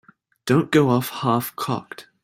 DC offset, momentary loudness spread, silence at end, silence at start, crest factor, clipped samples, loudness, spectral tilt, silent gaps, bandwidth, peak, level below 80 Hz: under 0.1%; 13 LU; 0.2 s; 0.45 s; 18 dB; under 0.1%; -21 LUFS; -6 dB/octave; none; 16 kHz; -4 dBFS; -60 dBFS